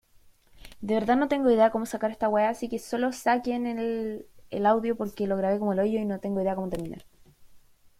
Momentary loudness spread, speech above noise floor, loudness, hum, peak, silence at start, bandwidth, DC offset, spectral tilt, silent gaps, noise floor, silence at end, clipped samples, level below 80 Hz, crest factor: 12 LU; 32 dB; -27 LUFS; none; -10 dBFS; 0.55 s; 16 kHz; under 0.1%; -6.5 dB/octave; none; -58 dBFS; 0.4 s; under 0.1%; -58 dBFS; 18 dB